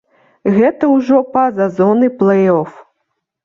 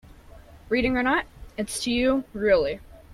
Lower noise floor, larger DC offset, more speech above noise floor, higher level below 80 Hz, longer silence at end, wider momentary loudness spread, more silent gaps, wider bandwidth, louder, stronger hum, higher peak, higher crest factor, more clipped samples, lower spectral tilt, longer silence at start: first, -71 dBFS vs -47 dBFS; neither; first, 59 dB vs 24 dB; second, -58 dBFS vs -44 dBFS; first, 0.65 s vs 0 s; second, 5 LU vs 11 LU; neither; second, 7 kHz vs 15 kHz; first, -13 LUFS vs -24 LUFS; neither; first, -2 dBFS vs -10 dBFS; about the same, 12 dB vs 16 dB; neither; first, -9.5 dB/octave vs -4 dB/octave; about the same, 0.45 s vs 0.35 s